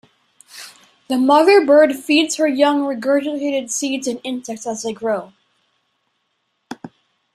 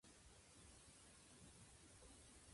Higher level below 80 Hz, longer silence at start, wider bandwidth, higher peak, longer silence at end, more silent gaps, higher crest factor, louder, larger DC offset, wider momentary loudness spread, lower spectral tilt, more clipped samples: first, -68 dBFS vs -74 dBFS; first, 0.55 s vs 0.05 s; first, 15 kHz vs 11.5 kHz; first, -2 dBFS vs -52 dBFS; first, 0.5 s vs 0 s; neither; about the same, 18 dB vs 14 dB; first, -17 LUFS vs -65 LUFS; neither; first, 24 LU vs 2 LU; about the same, -2.5 dB/octave vs -3 dB/octave; neither